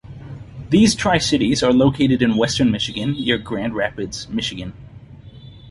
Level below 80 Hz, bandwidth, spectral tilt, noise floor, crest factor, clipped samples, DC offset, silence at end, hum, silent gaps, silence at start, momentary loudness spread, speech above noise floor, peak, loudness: -42 dBFS; 11.5 kHz; -5 dB/octave; -40 dBFS; 16 dB; under 0.1%; under 0.1%; 0 s; none; none; 0.05 s; 18 LU; 22 dB; -4 dBFS; -18 LUFS